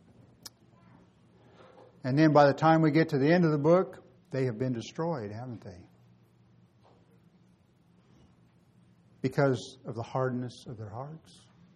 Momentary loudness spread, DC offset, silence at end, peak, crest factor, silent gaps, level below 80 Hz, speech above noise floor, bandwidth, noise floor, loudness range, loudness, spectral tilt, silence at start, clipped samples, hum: 23 LU; under 0.1%; 0.6 s; -8 dBFS; 22 dB; none; -70 dBFS; 36 dB; 12.5 kHz; -64 dBFS; 15 LU; -27 LUFS; -7.5 dB/octave; 2.05 s; under 0.1%; none